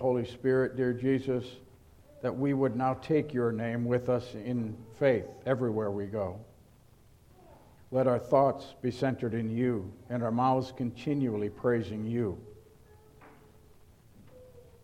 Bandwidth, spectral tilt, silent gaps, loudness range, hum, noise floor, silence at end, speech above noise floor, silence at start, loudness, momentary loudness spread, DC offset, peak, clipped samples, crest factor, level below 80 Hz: 13 kHz; -8.5 dB/octave; none; 4 LU; none; -59 dBFS; 0.2 s; 29 dB; 0 s; -31 LUFS; 8 LU; under 0.1%; -12 dBFS; under 0.1%; 20 dB; -62 dBFS